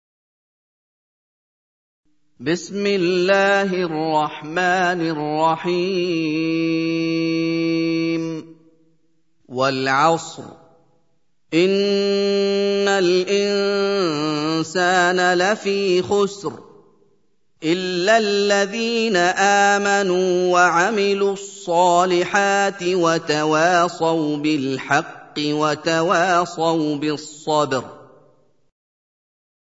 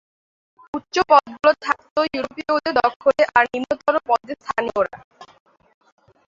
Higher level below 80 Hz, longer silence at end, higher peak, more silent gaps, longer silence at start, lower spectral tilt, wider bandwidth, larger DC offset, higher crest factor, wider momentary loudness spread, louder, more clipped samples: second, -68 dBFS vs -58 dBFS; first, 1.65 s vs 1.05 s; about the same, -2 dBFS vs -2 dBFS; second, none vs 1.91-1.96 s, 2.96-3.00 s, 5.04-5.11 s; first, 2.4 s vs 0.75 s; about the same, -4.5 dB/octave vs -3.5 dB/octave; about the same, 8 kHz vs 7.6 kHz; neither; about the same, 18 dB vs 20 dB; about the same, 8 LU vs 10 LU; about the same, -19 LUFS vs -20 LUFS; neither